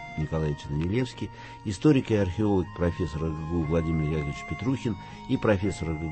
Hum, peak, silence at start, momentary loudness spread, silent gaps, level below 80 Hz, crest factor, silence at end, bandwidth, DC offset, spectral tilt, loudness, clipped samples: none; -8 dBFS; 0 s; 10 LU; none; -42 dBFS; 18 dB; 0 s; 8.8 kHz; under 0.1%; -7.5 dB/octave; -28 LUFS; under 0.1%